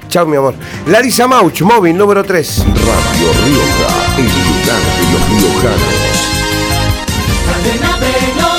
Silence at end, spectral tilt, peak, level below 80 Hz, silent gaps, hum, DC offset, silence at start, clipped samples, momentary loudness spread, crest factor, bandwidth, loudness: 0 s; -4.5 dB/octave; 0 dBFS; -22 dBFS; none; none; under 0.1%; 0 s; under 0.1%; 5 LU; 10 dB; over 20 kHz; -10 LUFS